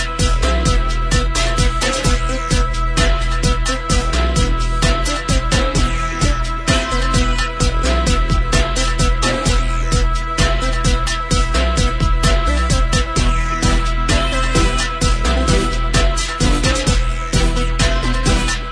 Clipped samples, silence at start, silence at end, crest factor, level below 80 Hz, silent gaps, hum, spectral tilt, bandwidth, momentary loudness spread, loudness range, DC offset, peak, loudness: under 0.1%; 0 s; 0 s; 14 dB; -18 dBFS; none; none; -4 dB/octave; 11 kHz; 2 LU; 1 LU; under 0.1%; 0 dBFS; -17 LUFS